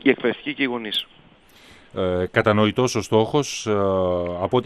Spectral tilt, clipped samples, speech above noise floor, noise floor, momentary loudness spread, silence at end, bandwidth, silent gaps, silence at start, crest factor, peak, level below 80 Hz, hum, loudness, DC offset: -5 dB/octave; under 0.1%; 29 dB; -50 dBFS; 7 LU; 0 s; 13.5 kHz; none; 0.05 s; 20 dB; -2 dBFS; -56 dBFS; none; -22 LUFS; under 0.1%